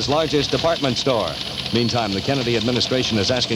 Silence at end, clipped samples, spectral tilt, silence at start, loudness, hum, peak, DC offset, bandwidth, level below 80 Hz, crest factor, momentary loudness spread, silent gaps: 0 s; under 0.1%; -4.5 dB/octave; 0 s; -20 LUFS; none; -4 dBFS; under 0.1%; 16.5 kHz; -44 dBFS; 16 dB; 3 LU; none